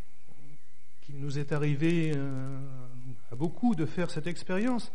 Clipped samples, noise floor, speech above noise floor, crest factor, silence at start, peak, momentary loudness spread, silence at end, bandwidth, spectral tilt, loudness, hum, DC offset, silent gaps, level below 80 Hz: under 0.1%; -64 dBFS; 33 dB; 16 dB; 0.4 s; -16 dBFS; 18 LU; 0.05 s; 10.5 kHz; -7 dB/octave; -32 LUFS; none; 4%; none; -64 dBFS